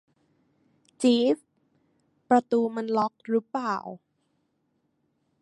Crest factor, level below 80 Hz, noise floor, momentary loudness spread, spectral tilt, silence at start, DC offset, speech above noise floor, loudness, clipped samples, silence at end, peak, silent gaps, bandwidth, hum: 20 dB; -78 dBFS; -74 dBFS; 10 LU; -5 dB/octave; 1 s; under 0.1%; 49 dB; -26 LUFS; under 0.1%; 1.45 s; -8 dBFS; none; 11.5 kHz; none